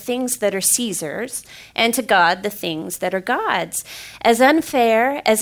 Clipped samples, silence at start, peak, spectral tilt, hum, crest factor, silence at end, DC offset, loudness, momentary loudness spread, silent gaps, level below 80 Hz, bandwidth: under 0.1%; 0 s; -4 dBFS; -2.5 dB/octave; none; 16 dB; 0 s; under 0.1%; -18 LUFS; 12 LU; none; -58 dBFS; 16 kHz